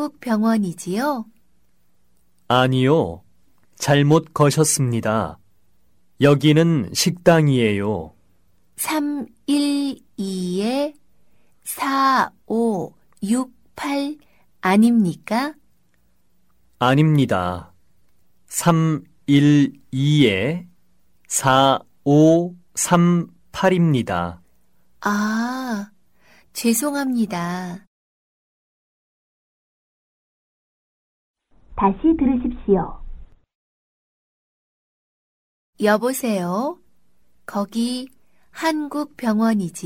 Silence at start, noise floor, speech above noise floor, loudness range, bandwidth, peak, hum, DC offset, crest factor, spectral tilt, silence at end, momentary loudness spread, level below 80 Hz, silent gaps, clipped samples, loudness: 0 s; -66 dBFS; 48 dB; 7 LU; 16.5 kHz; -2 dBFS; none; 0.2%; 18 dB; -5.5 dB/octave; 0 s; 14 LU; -48 dBFS; 27.87-31.34 s, 33.55-35.73 s; under 0.1%; -20 LUFS